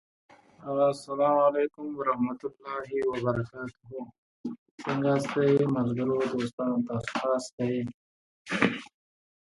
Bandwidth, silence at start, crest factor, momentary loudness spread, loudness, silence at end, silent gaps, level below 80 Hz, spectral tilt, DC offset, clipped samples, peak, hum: 11.5 kHz; 0.6 s; 22 dB; 16 LU; -28 LUFS; 0.7 s; 4.18-4.44 s, 4.58-4.78 s, 6.53-6.58 s, 7.52-7.58 s, 7.94-8.45 s; -64 dBFS; -6.5 dB/octave; under 0.1%; under 0.1%; -6 dBFS; none